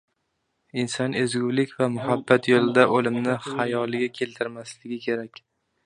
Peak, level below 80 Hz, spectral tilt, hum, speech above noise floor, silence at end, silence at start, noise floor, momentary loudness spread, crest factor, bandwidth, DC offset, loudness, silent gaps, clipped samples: -2 dBFS; -68 dBFS; -5.5 dB/octave; none; 52 dB; 0.6 s; 0.75 s; -75 dBFS; 13 LU; 24 dB; 10.5 kHz; under 0.1%; -24 LUFS; none; under 0.1%